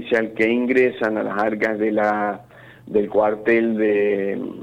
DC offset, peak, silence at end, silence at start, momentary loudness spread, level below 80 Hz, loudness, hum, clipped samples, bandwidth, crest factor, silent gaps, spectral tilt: under 0.1%; -6 dBFS; 0 s; 0 s; 6 LU; -60 dBFS; -20 LUFS; none; under 0.1%; 8.8 kHz; 14 dB; none; -7 dB/octave